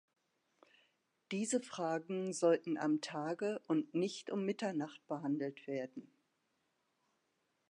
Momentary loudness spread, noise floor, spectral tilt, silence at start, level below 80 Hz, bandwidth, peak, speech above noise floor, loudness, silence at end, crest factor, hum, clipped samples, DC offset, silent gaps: 9 LU; -82 dBFS; -5 dB/octave; 1.3 s; under -90 dBFS; 11 kHz; -20 dBFS; 44 dB; -38 LUFS; 1.7 s; 20 dB; none; under 0.1%; under 0.1%; none